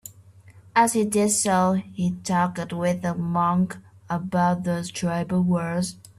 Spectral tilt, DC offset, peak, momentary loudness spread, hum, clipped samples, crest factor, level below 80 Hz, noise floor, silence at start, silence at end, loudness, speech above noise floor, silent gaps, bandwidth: -5.5 dB/octave; under 0.1%; -6 dBFS; 8 LU; none; under 0.1%; 18 dB; -58 dBFS; -50 dBFS; 0.05 s; 0.25 s; -23 LUFS; 27 dB; none; 13.5 kHz